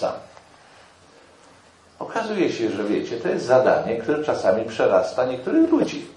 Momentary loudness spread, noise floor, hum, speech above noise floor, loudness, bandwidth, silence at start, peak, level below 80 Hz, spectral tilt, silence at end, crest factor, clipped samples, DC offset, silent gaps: 10 LU; -52 dBFS; none; 31 dB; -21 LUFS; 10.5 kHz; 0 s; -4 dBFS; -64 dBFS; -6 dB/octave; 0.05 s; 20 dB; under 0.1%; under 0.1%; none